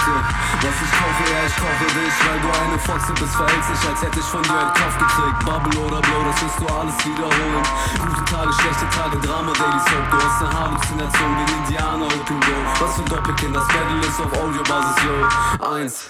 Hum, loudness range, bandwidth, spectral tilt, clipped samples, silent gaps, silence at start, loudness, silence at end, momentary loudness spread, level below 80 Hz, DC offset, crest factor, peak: none; 1 LU; 17 kHz; -3.5 dB/octave; under 0.1%; none; 0 s; -18 LUFS; 0 s; 5 LU; -30 dBFS; under 0.1%; 18 dB; -2 dBFS